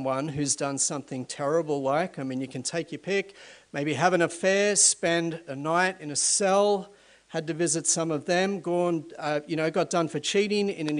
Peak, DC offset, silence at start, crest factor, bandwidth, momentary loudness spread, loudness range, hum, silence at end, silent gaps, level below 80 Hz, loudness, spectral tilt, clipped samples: -8 dBFS; under 0.1%; 0 s; 20 dB; 11 kHz; 11 LU; 5 LU; none; 0 s; none; -70 dBFS; -26 LUFS; -3 dB/octave; under 0.1%